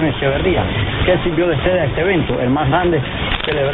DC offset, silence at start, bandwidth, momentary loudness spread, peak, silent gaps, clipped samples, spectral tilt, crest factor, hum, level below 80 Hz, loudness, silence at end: under 0.1%; 0 s; 4.2 kHz; 3 LU; 0 dBFS; none; under 0.1%; -11 dB/octave; 16 dB; none; -28 dBFS; -16 LUFS; 0 s